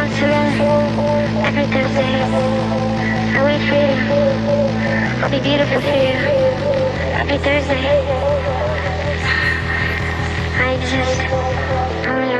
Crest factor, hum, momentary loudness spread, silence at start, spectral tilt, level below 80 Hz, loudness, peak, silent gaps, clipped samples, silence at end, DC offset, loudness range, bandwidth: 14 dB; none; 4 LU; 0 s; -6 dB/octave; -34 dBFS; -17 LUFS; -4 dBFS; none; under 0.1%; 0 s; under 0.1%; 2 LU; 10.5 kHz